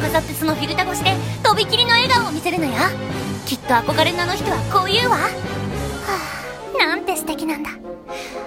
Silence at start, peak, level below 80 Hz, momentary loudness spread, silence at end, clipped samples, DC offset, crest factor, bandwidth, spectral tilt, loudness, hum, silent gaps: 0 s; -2 dBFS; -42 dBFS; 11 LU; 0 s; under 0.1%; under 0.1%; 18 dB; 16.5 kHz; -4 dB/octave; -19 LUFS; none; none